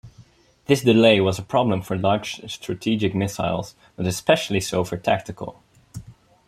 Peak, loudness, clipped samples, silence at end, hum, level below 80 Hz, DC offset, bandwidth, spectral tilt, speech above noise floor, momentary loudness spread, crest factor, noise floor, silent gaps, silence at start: -2 dBFS; -21 LUFS; under 0.1%; 0.35 s; none; -54 dBFS; under 0.1%; 15.5 kHz; -5.5 dB/octave; 31 dB; 21 LU; 20 dB; -52 dBFS; none; 0.05 s